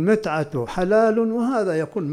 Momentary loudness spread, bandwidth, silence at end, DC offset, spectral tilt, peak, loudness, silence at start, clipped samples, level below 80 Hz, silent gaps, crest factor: 7 LU; 12.5 kHz; 0 s; under 0.1%; -7.5 dB/octave; -6 dBFS; -21 LUFS; 0 s; under 0.1%; -48 dBFS; none; 14 dB